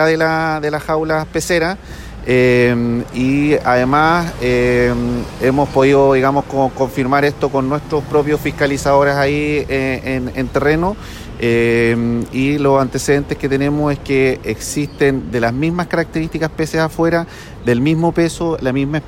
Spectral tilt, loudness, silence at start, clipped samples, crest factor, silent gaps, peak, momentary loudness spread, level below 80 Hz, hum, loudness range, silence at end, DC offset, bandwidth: -6 dB/octave; -16 LUFS; 0 s; under 0.1%; 14 dB; none; -2 dBFS; 8 LU; -34 dBFS; none; 3 LU; 0 s; under 0.1%; 16.5 kHz